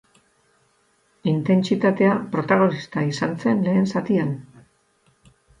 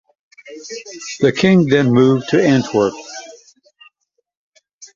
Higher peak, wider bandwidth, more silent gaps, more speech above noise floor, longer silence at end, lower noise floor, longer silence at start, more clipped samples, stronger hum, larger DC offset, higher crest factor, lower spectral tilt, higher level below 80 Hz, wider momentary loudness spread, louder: second, -6 dBFS vs -2 dBFS; first, 9.2 kHz vs 7.6 kHz; second, none vs 4.37-4.52 s, 4.73-4.79 s; second, 43 dB vs 55 dB; first, 1.2 s vs 0.1 s; second, -63 dBFS vs -70 dBFS; first, 1.25 s vs 0.45 s; neither; neither; neither; about the same, 18 dB vs 16 dB; first, -7.5 dB/octave vs -6 dB/octave; second, -62 dBFS vs -54 dBFS; second, 7 LU vs 19 LU; second, -21 LUFS vs -14 LUFS